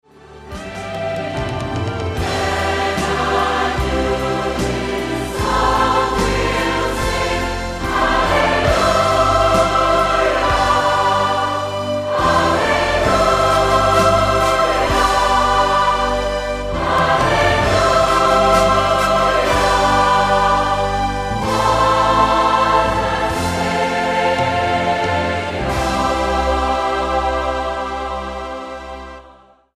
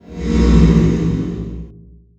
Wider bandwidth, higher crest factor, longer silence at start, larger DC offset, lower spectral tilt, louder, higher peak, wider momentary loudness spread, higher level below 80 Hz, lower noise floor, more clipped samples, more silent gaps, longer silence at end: first, 15.5 kHz vs 7.8 kHz; about the same, 14 dB vs 14 dB; first, 0.3 s vs 0.1 s; neither; second, -4.5 dB/octave vs -8 dB/octave; about the same, -16 LUFS vs -15 LUFS; about the same, -2 dBFS vs 0 dBFS; second, 9 LU vs 17 LU; second, -30 dBFS vs -20 dBFS; first, -46 dBFS vs -42 dBFS; neither; neither; about the same, 0.45 s vs 0.45 s